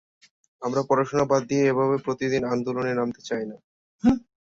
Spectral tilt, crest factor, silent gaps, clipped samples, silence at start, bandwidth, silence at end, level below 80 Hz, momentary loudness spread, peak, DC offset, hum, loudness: -6.5 dB/octave; 18 dB; 3.64-3.99 s; under 0.1%; 0.6 s; 7.6 kHz; 0.4 s; -54 dBFS; 9 LU; -8 dBFS; under 0.1%; none; -25 LUFS